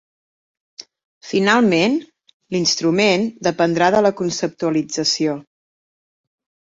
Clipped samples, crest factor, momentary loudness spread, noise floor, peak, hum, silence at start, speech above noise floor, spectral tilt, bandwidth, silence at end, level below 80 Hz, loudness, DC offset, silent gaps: under 0.1%; 18 dB; 8 LU; under -90 dBFS; -2 dBFS; none; 1.25 s; over 73 dB; -4 dB/octave; 7.8 kHz; 1.25 s; -60 dBFS; -18 LUFS; under 0.1%; 2.33-2.40 s